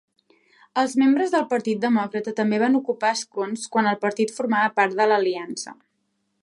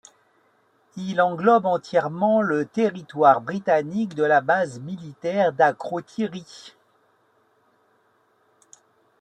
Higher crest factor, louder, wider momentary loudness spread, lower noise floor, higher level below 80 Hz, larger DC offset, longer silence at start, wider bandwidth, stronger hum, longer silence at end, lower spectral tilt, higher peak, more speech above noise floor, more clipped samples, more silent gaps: about the same, 18 dB vs 20 dB; about the same, -22 LUFS vs -22 LUFS; second, 9 LU vs 16 LU; first, -73 dBFS vs -64 dBFS; about the same, -76 dBFS vs -72 dBFS; neither; second, 0.75 s vs 0.95 s; first, 11.5 kHz vs 9.2 kHz; neither; second, 0.7 s vs 2.5 s; second, -4.5 dB/octave vs -6.5 dB/octave; about the same, -6 dBFS vs -4 dBFS; first, 51 dB vs 42 dB; neither; neither